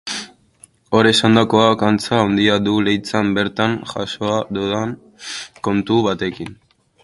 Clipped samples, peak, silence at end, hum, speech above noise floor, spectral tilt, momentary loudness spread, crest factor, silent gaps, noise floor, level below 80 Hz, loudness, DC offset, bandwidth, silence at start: under 0.1%; 0 dBFS; 0.5 s; none; 33 dB; -5 dB/octave; 15 LU; 18 dB; none; -50 dBFS; -50 dBFS; -17 LUFS; under 0.1%; 11.5 kHz; 0.05 s